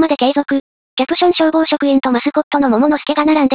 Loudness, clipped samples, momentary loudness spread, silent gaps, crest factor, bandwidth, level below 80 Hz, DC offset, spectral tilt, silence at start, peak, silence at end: -14 LUFS; under 0.1%; 7 LU; 0.60-0.97 s, 2.43-2.51 s; 12 dB; 4 kHz; -54 dBFS; 0.2%; -8.5 dB/octave; 0 s; -2 dBFS; 0 s